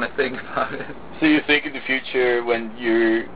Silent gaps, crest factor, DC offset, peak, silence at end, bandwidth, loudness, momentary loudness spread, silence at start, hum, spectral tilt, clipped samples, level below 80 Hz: none; 16 dB; 1%; -4 dBFS; 0 s; 4 kHz; -21 LUFS; 8 LU; 0 s; none; -8 dB/octave; under 0.1%; -52 dBFS